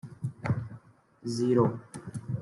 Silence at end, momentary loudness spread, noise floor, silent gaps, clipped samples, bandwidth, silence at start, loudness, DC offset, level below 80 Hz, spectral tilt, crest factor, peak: 0 s; 17 LU; -53 dBFS; none; under 0.1%; 12 kHz; 0.05 s; -30 LUFS; under 0.1%; -64 dBFS; -7.5 dB/octave; 20 dB; -12 dBFS